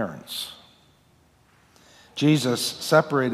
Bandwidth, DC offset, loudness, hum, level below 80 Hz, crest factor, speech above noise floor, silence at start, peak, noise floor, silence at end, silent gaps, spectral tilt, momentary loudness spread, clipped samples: 15.5 kHz; under 0.1%; -23 LUFS; none; -68 dBFS; 20 dB; 37 dB; 0 s; -6 dBFS; -60 dBFS; 0 s; none; -5 dB/octave; 14 LU; under 0.1%